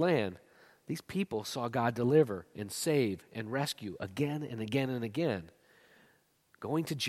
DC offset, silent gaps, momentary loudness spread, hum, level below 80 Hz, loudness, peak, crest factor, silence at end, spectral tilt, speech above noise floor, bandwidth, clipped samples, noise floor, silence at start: under 0.1%; none; 13 LU; none; -70 dBFS; -34 LUFS; -14 dBFS; 20 dB; 0 s; -5.5 dB/octave; 36 dB; 15.5 kHz; under 0.1%; -69 dBFS; 0 s